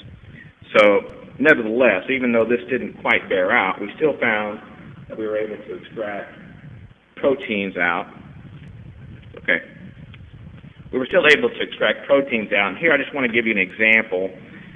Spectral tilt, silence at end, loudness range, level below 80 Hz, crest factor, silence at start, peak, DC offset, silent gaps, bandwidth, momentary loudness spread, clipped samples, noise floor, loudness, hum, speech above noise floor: -5.5 dB/octave; 0.1 s; 9 LU; -54 dBFS; 20 dB; 0.05 s; 0 dBFS; under 0.1%; none; 9.6 kHz; 17 LU; under 0.1%; -43 dBFS; -19 LUFS; none; 24 dB